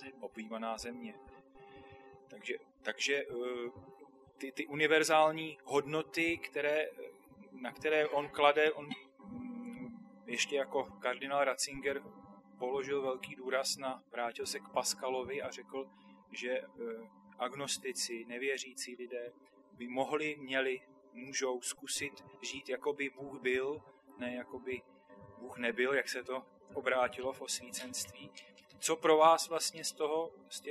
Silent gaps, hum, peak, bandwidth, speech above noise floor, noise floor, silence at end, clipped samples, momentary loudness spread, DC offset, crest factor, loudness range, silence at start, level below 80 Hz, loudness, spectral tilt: none; none; -12 dBFS; 13.5 kHz; 21 dB; -57 dBFS; 0 s; under 0.1%; 18 LU; under 0.1%; 26 dB; 7 LU; 0 s; -74 dBFS; -36 LUFS; -2.5 dB/octave